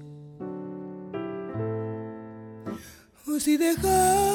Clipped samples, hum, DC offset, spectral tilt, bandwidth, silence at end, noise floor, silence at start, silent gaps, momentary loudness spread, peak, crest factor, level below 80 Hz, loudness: under 0.1%; none; under 0.1%; -4.5 dB/octave; 19 kHz; 0 s; -49 dBFS; 0 s; none; 20 LU; -10 dBFS; 18 dB; -48 dBFS; -27 LUFS